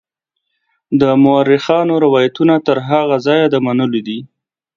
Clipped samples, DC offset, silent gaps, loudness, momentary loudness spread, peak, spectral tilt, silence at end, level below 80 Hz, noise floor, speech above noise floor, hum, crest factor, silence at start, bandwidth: under 0.1%; under 0.1%; none; -13 LUFS; 8 LU; 0 dBFS; -7.5 dB/octave; 0.5 s; -58 dBFS; -74 dBFS; 62 dB; none; 14 dB; 0.9 s; 7.2 kHz